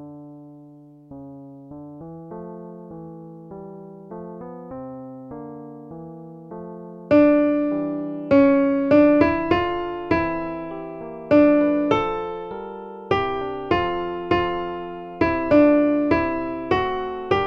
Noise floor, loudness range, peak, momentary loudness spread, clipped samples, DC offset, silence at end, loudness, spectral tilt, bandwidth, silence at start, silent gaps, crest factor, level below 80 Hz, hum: -46 dBFS; 19 LU; -4 dBFS; 23 LU; under 0.1%; under 0.1%; 0 s; -20 LUFS; -8 dB/octave; 6.2 kHz; 0 s; none; 18 dB; -48 dBFS; none